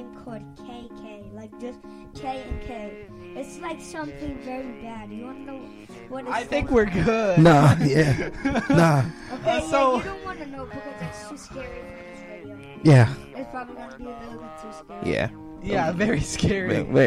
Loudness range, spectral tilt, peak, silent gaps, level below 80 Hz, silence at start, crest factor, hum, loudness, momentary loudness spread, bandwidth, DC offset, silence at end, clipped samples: 16 LU; -6.5 dB/octave; -6 dBFS; none; -44 dBFS; 0 s; 18 dB; none; -22 LUFS; 23 LU; 13 kHz; under 0.1%; 0 s; under 0.1%